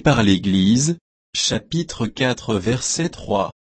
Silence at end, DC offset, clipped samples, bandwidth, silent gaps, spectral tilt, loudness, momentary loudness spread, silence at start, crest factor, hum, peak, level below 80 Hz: 0.1 s; under 0.1%; under 0.1%; 8.8 kHz; 1.01-1.33 s; -4.5 dB/octave; -20 LUFS; 9 LU; 0.05 s; 16 dB; none; -2 dBFS; -44 dBFS